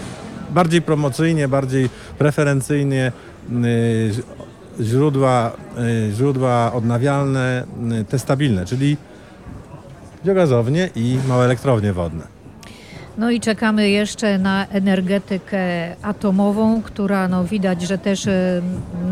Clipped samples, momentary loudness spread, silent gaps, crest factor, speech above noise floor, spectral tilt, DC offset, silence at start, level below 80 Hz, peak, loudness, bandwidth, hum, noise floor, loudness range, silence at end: under 0.1%; 11 LU; none; 18 dB; 21 dB; -6.5 dB/octave; under 0.1%; 0 s; -46 dBFS; -2 dBFS; -19 LUFS; 14.5 kHz; none; -39 dBFS; 2 LU; 0 s